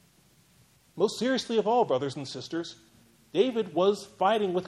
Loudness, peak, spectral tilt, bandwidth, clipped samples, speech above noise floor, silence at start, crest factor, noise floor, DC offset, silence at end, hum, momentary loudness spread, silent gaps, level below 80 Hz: -28 LUFS; -10 dBFS; -5 dB/octave; 12.5 kHz; under 0.1%; 35 dB; 0.95 s; 18 dB; -62 dBFS; under 0.1%; 0 s; none; 10 LU; none; -72 dBFS